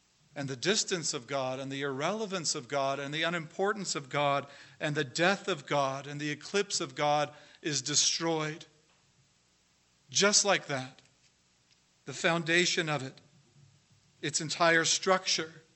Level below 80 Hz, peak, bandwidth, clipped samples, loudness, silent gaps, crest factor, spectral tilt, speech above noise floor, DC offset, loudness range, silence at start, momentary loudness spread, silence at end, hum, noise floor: -80 dBFS; -10 dBFS; 8.6 kHz; under 0.1%; -30 LUFS; none; 24 dB; -2.5 dB/octave; 38 dB; under 0.1%; 3 LU; 0.35 s; 12 LU; 0.15 s; none; -69 dBFS